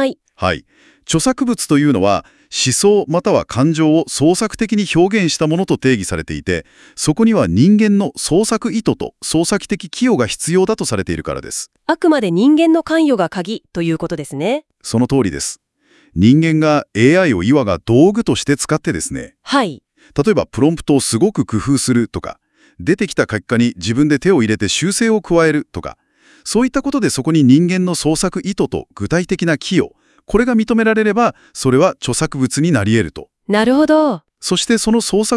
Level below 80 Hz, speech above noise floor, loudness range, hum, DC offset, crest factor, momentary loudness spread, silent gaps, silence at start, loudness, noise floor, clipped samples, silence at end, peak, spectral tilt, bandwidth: -42 dBFS; 39 dB; 3 LU; none; under 0.1%; 14 dB; 11 LU; none; 0 s; -15 LUFS; -54 dBFS; under 0.1%; 0 s; 0 dBFS; -5 dB/octave; 12 kHz